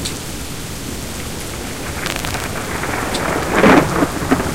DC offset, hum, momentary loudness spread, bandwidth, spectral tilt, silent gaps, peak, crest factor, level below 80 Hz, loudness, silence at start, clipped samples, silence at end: 2%; none; 15 LU; 17 kHz; -4.5 dB/octave; none; 0 dBFS; 18 dB; -34 dBFS; -18 LUFS; 0 s; under 0.1%; 0 s